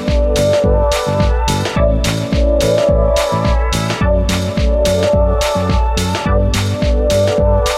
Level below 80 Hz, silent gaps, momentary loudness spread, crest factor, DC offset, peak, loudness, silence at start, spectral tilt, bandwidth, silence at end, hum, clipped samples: -18 dBFS; none; 3 LU; 12 dB; under 0.1%; -2 dBFS; -14 LUFS; 0 s; -5.5 dB/octave; 15 kHz; 0 s; none; under 0.1%